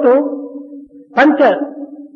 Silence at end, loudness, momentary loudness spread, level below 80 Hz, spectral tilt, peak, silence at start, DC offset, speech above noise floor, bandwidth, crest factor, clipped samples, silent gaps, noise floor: 0.1 s; -13 LUFS; 21 LU; -64 dBFS; -6 dB/octave; 0 dBFS; 0 s; under 0.1%; 23 dB; 7 kHz; 14 dB; under 0.1%; none; -35 dBFS